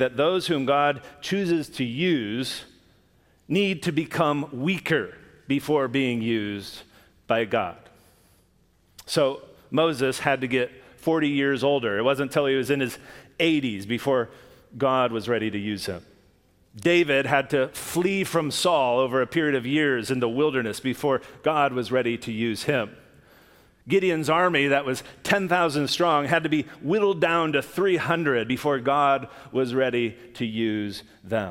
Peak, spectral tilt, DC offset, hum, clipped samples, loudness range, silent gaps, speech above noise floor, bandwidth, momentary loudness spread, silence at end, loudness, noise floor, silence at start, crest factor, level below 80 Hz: -4 dBFS; -5 dB/octave; under 0.1%; none; under 0.1%; 4 LU; none; 38 dB; 16.5 kHz; 9 LU; 0 s; -24 LUFS; -62 dBFS; 0 s; 20 dB; -62 dBFS